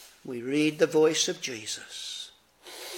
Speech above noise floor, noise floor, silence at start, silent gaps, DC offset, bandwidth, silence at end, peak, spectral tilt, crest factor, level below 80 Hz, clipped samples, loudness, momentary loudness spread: 23 dB; -50 dBFS; 0 s; none; under 0.1%; 17 kHz; 0 s; -10 dBFS; -3 dB/octave; 20 dB; -78 dBFS; under 0.1%; -27 LUFS; 18 LU